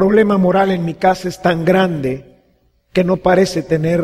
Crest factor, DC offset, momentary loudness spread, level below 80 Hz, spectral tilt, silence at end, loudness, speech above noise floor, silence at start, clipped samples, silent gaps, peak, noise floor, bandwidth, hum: 14 dB; under 0.1%; 8 LU; -44 dBFS; -7 dB/octave; 0 s; -15 LUFS; 43 dB; 0 s; under 0.1%; none; -2 dBFS; -57 dBFS; 14.5 kHz; none